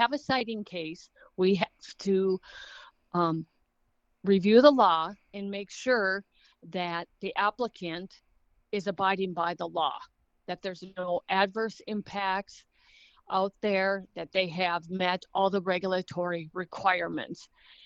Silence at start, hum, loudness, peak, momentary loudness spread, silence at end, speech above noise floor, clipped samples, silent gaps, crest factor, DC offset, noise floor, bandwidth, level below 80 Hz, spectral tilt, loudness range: 0 s; none; -29 LUFS; -4 dBFS; 13 LU; 0.4 s; 44 dB; under 0.1%; none; 26 dB; under 0.1%; -73 dBFS; 8 kHz; -70 dBFS; -5.5 dB/octave; 7 LU